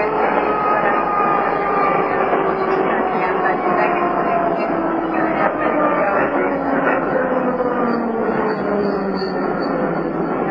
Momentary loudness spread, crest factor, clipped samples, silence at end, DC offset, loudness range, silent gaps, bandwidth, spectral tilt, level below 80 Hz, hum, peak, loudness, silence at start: 3 LU; 16 dB; under 0.1%; 0 s; 0.2%; 2 LU; none; 5.8 kHz; -9 dB/octave; -48 dBFS; none; -2 dBFS; -18 LUFS; 0 s